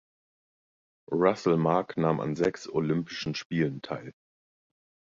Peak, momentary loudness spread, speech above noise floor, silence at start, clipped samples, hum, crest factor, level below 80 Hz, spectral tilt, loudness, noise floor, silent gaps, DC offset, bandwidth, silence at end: -10 dBFS; 12 LU; over 62 dB; 1.1 s; under 0.1%; none; 20 dB; -64 dBFS; -7 dB/octave; -28 LUFS; under -90 dBFS; 3.45-3.50 s; under 0.1%; 7.6 kHz; 1 s